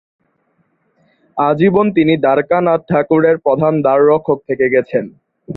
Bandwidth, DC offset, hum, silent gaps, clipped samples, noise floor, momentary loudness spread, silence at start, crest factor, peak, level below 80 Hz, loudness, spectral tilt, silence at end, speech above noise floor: 4.2 kHz; under 0.1%; none; none; under 0.1%; -62 dBFS; 7 LU; 1.35 s; 14 dB; 0 dBFS; -54 dBFS; -13 LUFS; -10.5 dB/octave; 0 s; 49 dB